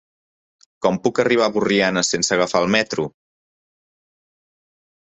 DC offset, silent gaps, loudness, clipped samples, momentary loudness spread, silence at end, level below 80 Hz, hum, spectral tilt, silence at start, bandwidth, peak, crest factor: under 0.1%; none; -19 LUFS; under 0.1%; 6 LU; 1.95 s; -58 dBFS; none; -3.5 dB/octave; 0.8 s; 8.4 kHz; -2 dBFS; 20 dB